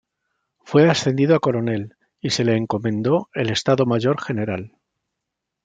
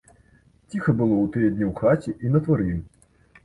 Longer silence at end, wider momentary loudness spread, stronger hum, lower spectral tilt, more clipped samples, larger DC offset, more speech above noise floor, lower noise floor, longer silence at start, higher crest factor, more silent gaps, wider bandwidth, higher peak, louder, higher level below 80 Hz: first, 0.95 s vs 0.6 s; first, 10 LU vs 7 LU; neither; second, -6 dB/octave vs -10 dB/octave; neither; neither; first, 62 dB vs 36 dB; first, -82 dBFS vs -57 dBFS; about the same, 0.65 s vs 0.7 s; about the same, 18 dB vs 16 dB; neither; second, 9.4 kHz vs 11 kHz; first, -2 dBFS vs -8 dBFS; first, -20 LUFS vs -23 LUFS; second, -60 dBFS vs -46 dBFS